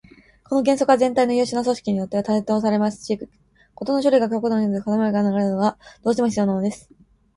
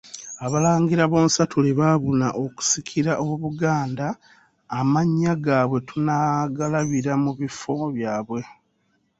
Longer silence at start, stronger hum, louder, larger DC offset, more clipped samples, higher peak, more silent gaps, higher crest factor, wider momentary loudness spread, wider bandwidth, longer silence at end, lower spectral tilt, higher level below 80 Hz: first, 0.5 s vs 0.05 s; neither; about the same, -21 LUFS vs -22 LUFS; neither; neither; about the same, -4 dBFS vs -4 dBFS; neither; about the same, 18 dB vs 18 dB; about the same, 10 LU vs 11 LU; first, 11.5 kHz vs 8 kHz; second, 0.55 s vs 0.7 s; about the same, -6.5 dB/octave vs -5.5 dB/octave; about the same, -58 dBFS vs -58 dBFS